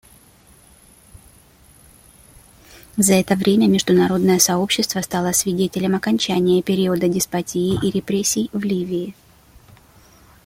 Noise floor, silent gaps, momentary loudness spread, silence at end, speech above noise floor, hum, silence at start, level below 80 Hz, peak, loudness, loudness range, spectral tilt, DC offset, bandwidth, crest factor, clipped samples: -50 dBFS; none; 7 LU; 1.35 s; 32 dB; none; 2.75 s; -50 dBFS; 0 dBFS; -18 LUFS; 6 LU; -4.5 dB/octave; under 0.1%; 16.5 kHz; 20 dB; under 0.1%